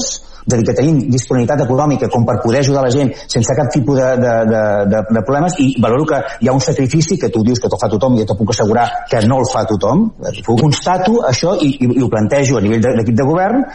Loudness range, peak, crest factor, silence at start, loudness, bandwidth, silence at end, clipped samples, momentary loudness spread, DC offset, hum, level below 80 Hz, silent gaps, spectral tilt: 1 LU; -2 dBFS; 10 dB; 0 s; -13 LUFS; 10.5 kHz; 0 s; under 0.1%; 3 LU; under 0.1%; none; -36 dBFS; none; -6 dB/octave